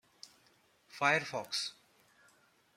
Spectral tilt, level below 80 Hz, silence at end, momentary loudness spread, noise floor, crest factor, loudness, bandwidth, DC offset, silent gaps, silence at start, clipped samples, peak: -2.5 dB/octave; -84 dBFS; 1.05 s; 25 LU; -69 dBFS; 24 dB; -34 LUFS; 16 kHz; under 0.1%; none; 0.25 s; under 0.1%; -14 dBFS